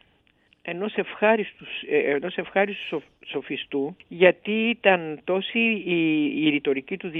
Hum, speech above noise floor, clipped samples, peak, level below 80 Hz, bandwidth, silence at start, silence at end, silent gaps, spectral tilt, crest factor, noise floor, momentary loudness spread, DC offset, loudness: none; 39 dB; under 0.1%; 0 dBFS; -70 dBFS; 4 kHz; 0.65 s; 0 s; none; -8.5 dB/octave; 24 dB; -63 dBFS; 13 LU; under 0.1%; -24 LUFS